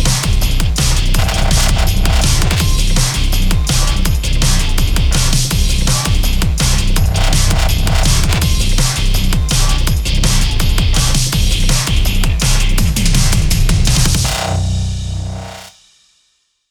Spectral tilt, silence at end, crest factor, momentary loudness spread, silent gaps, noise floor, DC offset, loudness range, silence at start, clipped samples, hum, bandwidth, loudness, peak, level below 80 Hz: -3.5 dB/octave; 1 s; 10 dB; 3 LU; none; -61 dBFS; under 0.1%; 1 LU; 0 s; under 0.1%; 60 Hz at -30 dBFS; 18.5 kHz; -14 LUFS; 0 dBFS; -14 dBFS